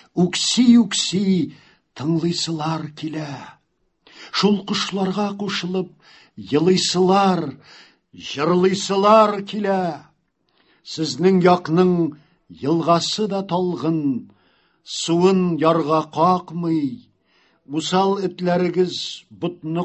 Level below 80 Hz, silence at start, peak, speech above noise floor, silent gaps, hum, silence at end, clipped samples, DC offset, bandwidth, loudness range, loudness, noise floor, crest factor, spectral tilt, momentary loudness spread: -62 dBFS; 0.15 s; -2 dBFS; 48 dB; none; none; 0 s; under 0.1%; under 0.1%; 8.6 kHz; 5 LU; -19 LUFS; -67 dBFS; 18 dB; -5 dB/octave; 14 LU